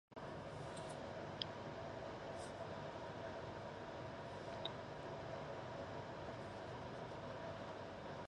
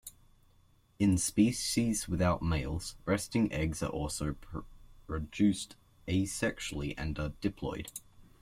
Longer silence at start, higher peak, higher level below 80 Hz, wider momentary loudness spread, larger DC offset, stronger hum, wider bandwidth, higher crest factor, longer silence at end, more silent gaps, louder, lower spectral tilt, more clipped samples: about the same, 0.1 s vs 0.05 s; second, -22 dBFS vs -14 dBFS; second, -68 dBFS vs -48 dBFS; second, 3 LU vs 15 LU; neither; neither; second, 11 kHz vs 16 kHz; first, 26 dB vs 18 dB; second, 0 s vs 0.2 s; neither; second, -49 LUFS vs -33 LUFS; about the same, -5.5 dB/octave vs -5 dB/octave; neither